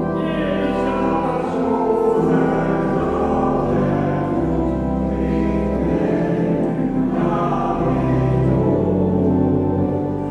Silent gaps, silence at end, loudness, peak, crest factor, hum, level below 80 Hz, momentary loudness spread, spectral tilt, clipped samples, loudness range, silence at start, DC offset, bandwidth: none; 0 s; -19 LUFS; -6 dBFS; 12 dB; none; -34 dBFS; 3 LU; -9.5 dB/octave; under 0.1%; 1 LU; 0 s; under 0.1%; 9.6 kHz